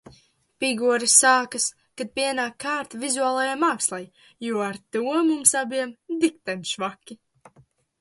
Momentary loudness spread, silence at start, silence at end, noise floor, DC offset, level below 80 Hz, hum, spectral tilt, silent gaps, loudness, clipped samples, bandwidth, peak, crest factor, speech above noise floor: 14 LU; 0.6 s; 0.85 s; -59 dBFS; under 0.1%; -72 dBFS; none; -1.5 dB/octave; none; -22 LUFS; under 0.1%; 12 kHz; -2 dBFS; 24 dB; 35 dB